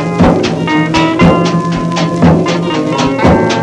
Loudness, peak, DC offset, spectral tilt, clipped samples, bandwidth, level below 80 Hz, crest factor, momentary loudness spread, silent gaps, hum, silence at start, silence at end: -10 LUFS; 0 dBFS; under 0.1%; -6.5 dB/octave; 0.4%; 9.8 kHz; -28 dBFS; 10 dB; 5 LU; none; none; 0 s; 0 s